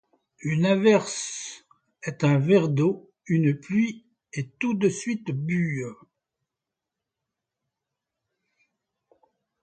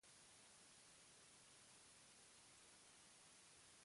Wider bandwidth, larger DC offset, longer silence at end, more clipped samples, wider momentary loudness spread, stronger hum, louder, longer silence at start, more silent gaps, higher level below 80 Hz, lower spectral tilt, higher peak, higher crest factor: second, 9.2 kHz vs 11.5 kHz; neither; first, 3.7 s vs 0 s; neither; first, 16 LU vs 0 LU; neither; first, -24 LUFS vs -66 LUFS; first, 0.4 s vs 0 s; neither; first, -68 dBFS vs under -90 dBFS; first, -6 dB/octave vs -1 dB/octave; first, -8 dBFS vs -56 dBFS; first, 20 dB vs 14 dB